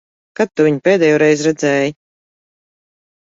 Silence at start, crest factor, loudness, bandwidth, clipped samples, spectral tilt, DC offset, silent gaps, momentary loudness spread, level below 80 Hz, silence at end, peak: 0.4 s; 14 dB; -14 LUFS; 7.8 kHz; under 0.1%; -5.5 dB/octave; under 0.1%; none; 9 LU; -62 dBFS; 1.3 s; -2 dBFS